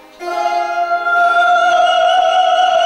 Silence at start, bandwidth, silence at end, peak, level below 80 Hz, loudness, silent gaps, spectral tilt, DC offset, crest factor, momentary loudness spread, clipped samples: 0.2 s; 10.5 kHz; 0 s; -4 dBFS; -56 dBFS; -13 LUFS; none; -0.5 dB/octave; under 0.1%; 10 dB; 6 LU; under 0.1%